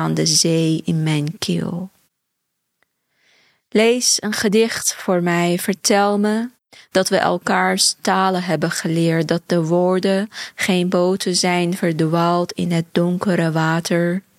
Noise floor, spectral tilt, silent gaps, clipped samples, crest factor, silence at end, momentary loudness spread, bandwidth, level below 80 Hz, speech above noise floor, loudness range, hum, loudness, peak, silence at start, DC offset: -75 dBFS; -4 dB/octave; none; under 0.1%; 18 dB; 0.2 s; 6 LU; 15.5 kHz; -62 dBFS; 57 dB; 4 LU; none; -18 LUFS; -2 dBFS; 0 s; under 0.1%